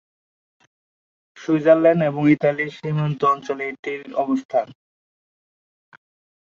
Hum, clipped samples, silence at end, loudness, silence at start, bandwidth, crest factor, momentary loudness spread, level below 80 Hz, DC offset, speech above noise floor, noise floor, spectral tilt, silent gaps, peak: none; under 0.1%; 1.85 s; -20 LUFS; 1.35 s; 7.4 kHz; 20 dB; 12 LU; -68 dBFS; under 0.1%; over 71 dB; under -90 dBFS; -8 dB/octave; 3.79-3.83 s, 4.45-4.49 s; -2 dBFS